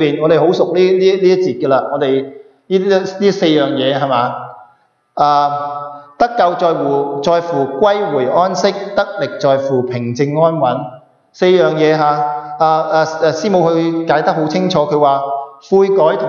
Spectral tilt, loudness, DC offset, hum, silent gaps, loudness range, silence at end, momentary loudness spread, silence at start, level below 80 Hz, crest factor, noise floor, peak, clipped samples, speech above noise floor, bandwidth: -6 dB/octave; -14 LUFS; under 0.1%; none; none; 2 LU; 0 s; 8 LU; 0 s; -58 dBFS; 12 dB; -53 dBFS; 0 dBFS; under 0.1%; 41 dB; 7.2 kHz